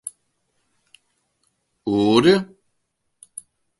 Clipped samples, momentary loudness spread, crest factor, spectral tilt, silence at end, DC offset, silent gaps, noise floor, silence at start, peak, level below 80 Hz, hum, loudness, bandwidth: under 0.1%; 24 LU; 22 dB; -5.5 dB/octave; 1.35 s; under 0.1%; none; -73 dBFS; 0.05 s; -2 dBFS; -60 dBFS; none; -18 LUFS; 11.5 kHz